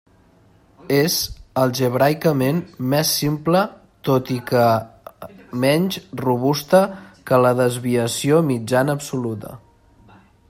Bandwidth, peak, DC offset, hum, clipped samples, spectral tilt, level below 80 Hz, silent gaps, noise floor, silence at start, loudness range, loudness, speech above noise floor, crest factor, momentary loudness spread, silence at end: 16.5 kHz; -2 dBFS; under 0.1%; none; under 0.1%; -5 dB/octave; -52 dBFS; none; -53 dBFS; 0.9 s; 2 LU; -19 LUFS; 35 dB; 18 dB; 11 LU; 0.9 s